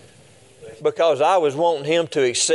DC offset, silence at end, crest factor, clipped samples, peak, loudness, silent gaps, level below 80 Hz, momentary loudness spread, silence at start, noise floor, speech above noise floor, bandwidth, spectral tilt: under 0.1%; 0 s; 14 dB; under 0.1%; -6 dBFS; -19 LUFS; none; -70 dBFS; 6 LU; 0.6 s; -50 dBFS; 31 dB; 11.5 kHz; -3 dB/octave